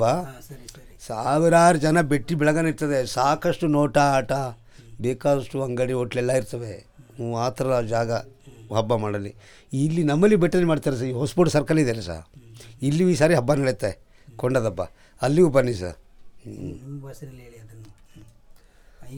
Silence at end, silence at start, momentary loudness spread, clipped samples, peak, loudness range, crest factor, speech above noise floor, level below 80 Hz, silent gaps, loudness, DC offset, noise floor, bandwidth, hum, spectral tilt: 0 s; 0 s; 19 LU; under 0.1%; -4 dBFS; 6 LU; 18 dB; 28 dB; -48 dBFS; none; -22 LUFS; under 0.1%; -50 dBFS; 18.5 kHz; none; -6.5 dB/octave